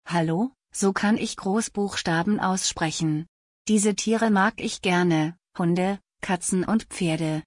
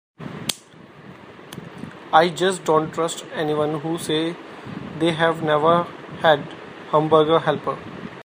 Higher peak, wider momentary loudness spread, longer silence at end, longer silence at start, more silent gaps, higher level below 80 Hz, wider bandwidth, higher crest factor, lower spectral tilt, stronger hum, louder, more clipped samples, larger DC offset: second, -10 dBFS vs 0 dBFS; second, 7 LU vs 20 LU; about the same, 0.05 s vs 0 s; second, 0.05 s vs 0.2 s; first, 3.28-3.65 s vs none; first, -56 dBFS vs -62 dBFS; second, 11 kHz vs 15.5 kHz; second, 16 dB vs 22 dB; about the same, -4.5 dB/octave vs -5 dB/octave; neither; second, -24 LUFS vs -21 LUFS; neither; neither